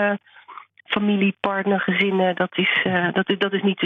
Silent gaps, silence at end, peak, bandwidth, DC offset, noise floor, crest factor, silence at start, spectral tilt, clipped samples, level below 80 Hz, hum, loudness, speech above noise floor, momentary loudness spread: none; 0 s; -6 dBFS; 4.5 kHz; under 0.1%; -42 dBFS; 16 dB; 0 s; -8 dB/octave; under 0.1%; -68 dBFS; none; -21 LUFS; 21 dB; 4 LU